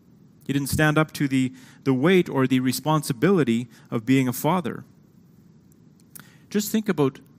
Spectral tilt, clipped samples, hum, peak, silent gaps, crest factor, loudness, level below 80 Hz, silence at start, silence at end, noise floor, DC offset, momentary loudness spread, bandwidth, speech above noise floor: -6 dB/octave; under 0.1%; none; -4 dBFS; none; 20 dB; -23 LUFS; -56 dBFS; 0.5 s; 0.25 s; -53 dBFS; under 0.1%; 10 LU; 16 kHz; 31 dB